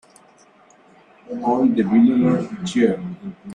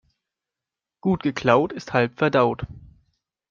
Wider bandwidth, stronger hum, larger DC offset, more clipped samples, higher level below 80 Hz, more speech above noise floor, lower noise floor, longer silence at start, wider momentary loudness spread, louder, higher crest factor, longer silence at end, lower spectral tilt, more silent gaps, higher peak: first, 10 kHz vs 7.4 kHz; neither; neither; neither; second, -60 dBFS vs -52 dBFS; second, 34 dB vs 67 dB; second, -52 dBFS vs -88 dBFS; first, 1.3 s vs 1.05 s; first, 17 LU vs 9 LU; first, -18 LUFS vs -22 LUFS; second, 16 dB vs 22 dB; second, 0 s vs 0.7 s; about the same, -7 dB/octave vs -7 dB/octave; neither; about the same, -4 dBFS vs -4 dBFS